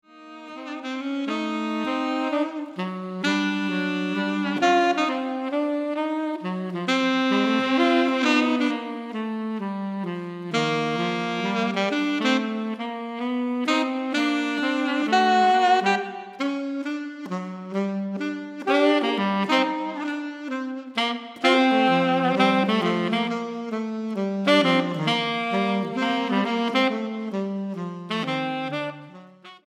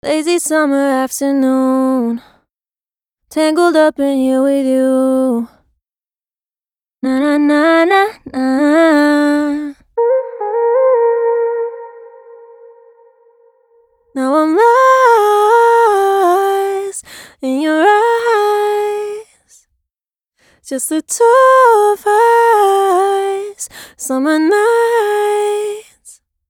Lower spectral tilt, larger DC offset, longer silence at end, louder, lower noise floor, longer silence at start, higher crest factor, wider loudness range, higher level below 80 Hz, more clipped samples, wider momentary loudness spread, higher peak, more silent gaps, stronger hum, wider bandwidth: first, -5 dB/octave vs -2.5 dB/octave; neither; second, 0.1 s vs 0.4 s; second, -24 LUFS vs -12 LUFS; second, -46 dBFS vs under -90 dBFS; about the same, 0.15 s vs 0.05 s; first, 18 dB vs 12 dB; about the same, 4 LU vs 6 LU; second, -84 dBFS vs -60 dBFS; neither; about the same, 11 LU vs 13 LU; second, -4 dBFS vs 0 dBFS; neither; neither; second, 11 kHz vs 19 kHz